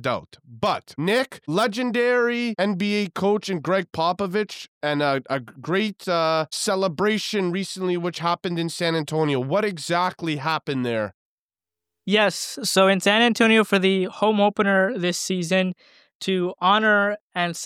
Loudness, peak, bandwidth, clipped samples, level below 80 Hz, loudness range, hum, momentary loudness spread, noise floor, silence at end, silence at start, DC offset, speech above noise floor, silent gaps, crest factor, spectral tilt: -22 LUFS; -6 dBFS; 16 kHz; under 0.1%; -68 dBFS; 5 LU; none; 9 LU; under -90 dBFS; 0 s; 0 s; under 0.1%; over 68 dB; 4.68-4.81 s, 11.14-11.49 s, 16.15-16.20 s, 17.21-17.30 s; 16 dB; -4.5 dB/octave